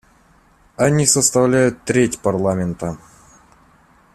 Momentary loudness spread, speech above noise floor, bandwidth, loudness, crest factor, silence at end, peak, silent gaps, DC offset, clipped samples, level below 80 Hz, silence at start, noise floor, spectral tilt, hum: 13 LU; 37 dB; 14.5 kHz; -17 LUFS; 20 dB; 1.2 s; 0 dBFS; none; under 0.1%; under 0.1%; -48 dBFS; 0.8 s; -53 dBFS; -4.5 dB/octave; none